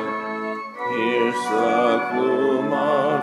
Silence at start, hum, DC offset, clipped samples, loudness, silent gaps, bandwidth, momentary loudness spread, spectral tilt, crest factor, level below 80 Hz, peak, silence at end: 0 s; none; under 0.1%; under 0.1%; -21 LUFS; none; 13 kHz; 9 LU; -5.5 dB/octave; 14 dB; -80 dBFS; -8 dBFS; 0 s